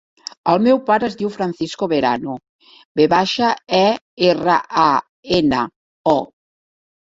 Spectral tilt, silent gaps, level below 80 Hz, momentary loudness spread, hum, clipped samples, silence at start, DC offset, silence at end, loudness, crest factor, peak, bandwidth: -5.5 dB/octave; 2.49-2.59 s, 2.85-2.95 s, 4.01-4.17 s, 5.09-5.23 s, 5.76-6.04 s; -52 dBFS; 9 LU; none; under 0.1%; 0.45 s; under 0.1%; 0.85 s; -18 LUFS; 18 dB; 0 dBFS; 7.8 kHz